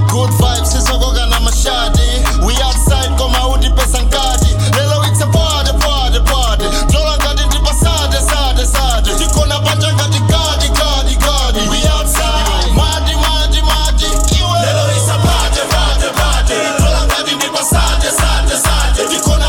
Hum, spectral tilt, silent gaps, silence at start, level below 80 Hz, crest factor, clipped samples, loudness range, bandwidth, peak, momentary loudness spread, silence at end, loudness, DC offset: none; -3.5 dB/octave; none; 0 s; -14 dBFS; 10 dB; under 0.1%; 0 LU; 17.5 kHz; -2 dBFS; 1 LU; 0 s; -12 LUFS; under 0.1%